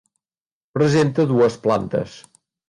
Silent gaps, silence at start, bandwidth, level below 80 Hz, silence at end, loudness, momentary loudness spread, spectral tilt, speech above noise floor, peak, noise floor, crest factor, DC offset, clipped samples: none; 0.75 s; 11 kHz; -54 dBFS; 0.5 s; -19 LUFS; 11 LU; -7 dB/octave; over 72 dB; -6 dBFS; under -90 dBFS; 14 dB; under 0.1%; under 0.1%